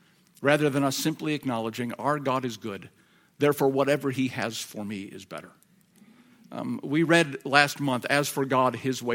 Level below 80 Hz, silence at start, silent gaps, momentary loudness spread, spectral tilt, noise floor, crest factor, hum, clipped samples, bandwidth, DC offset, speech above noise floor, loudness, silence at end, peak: -72 dBFS; 0.4 s; none; 15 LU; -4.5 dB/octave; -58 dBFS; 26 dB; none; under 0.1%; 17.5 kHz; under 0.1%; 32 dB; -26 LUFS; 0 s; -2 dBFS